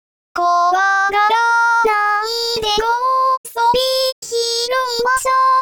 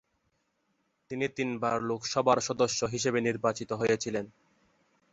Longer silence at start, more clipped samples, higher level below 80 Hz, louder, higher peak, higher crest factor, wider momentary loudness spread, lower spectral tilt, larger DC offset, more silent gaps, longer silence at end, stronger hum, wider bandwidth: second, 0.35 s vs 1.1 s; neither; first, -48 dBFS vs -66 dBFS; first, -15 LUFS vs -30 LUFS; first, -6 dBFS vs -10 dBFS; second, 10 dB vs 20 dB; second, 5 LU vs 8 LU; second, -0.5 dB/octave vs -4 dB/octave; first, 0.2% vs under 0.1%; first, 3.37-3.44 s, 4.12-4.22 s vs none; second, 0 s vs 0.85 s; neither; first, over 20 kHz vs 8.2 kHz